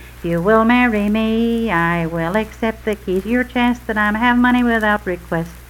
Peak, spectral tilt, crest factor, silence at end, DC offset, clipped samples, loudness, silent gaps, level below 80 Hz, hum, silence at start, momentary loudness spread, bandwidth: 0 dBFS; -6.5 dB/octave; 16 dB; 0.05 s; under 0.1%; under 0.1%; -17 LUFS; none; -36 dBFS; none; 0 s; 9 LU; 16.5 kHz